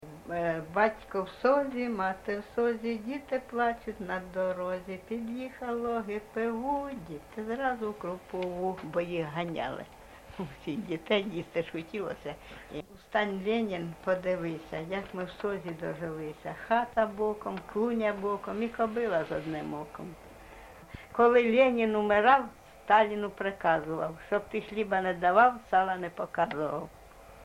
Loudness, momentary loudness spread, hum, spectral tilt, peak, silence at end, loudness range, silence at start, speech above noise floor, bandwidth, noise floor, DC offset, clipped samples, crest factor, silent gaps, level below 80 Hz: -31 LUFS; 16 LU; none; -6.5 dB/octave; -10 dBFS; 0 s; 8 LU; 0 s; 20 dB; 16 kHz; -50 dBFS; under 0.1%; under 0.1%; 20 dB; none; -60 dBFS